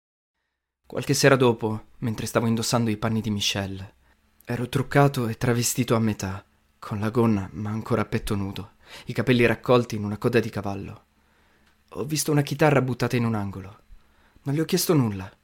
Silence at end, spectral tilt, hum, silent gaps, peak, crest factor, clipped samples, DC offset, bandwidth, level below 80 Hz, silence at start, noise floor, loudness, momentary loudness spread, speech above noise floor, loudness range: 0.15 s; -5 dB/octave; none; none; -4 dBFS; 20 dB; under 0.1%; under 0.1%; 16.5 kHz; -50 dBFS; 0.9 s; -80 dBFS; -24 LUFS; 15 LU; 56 dB; 3 LU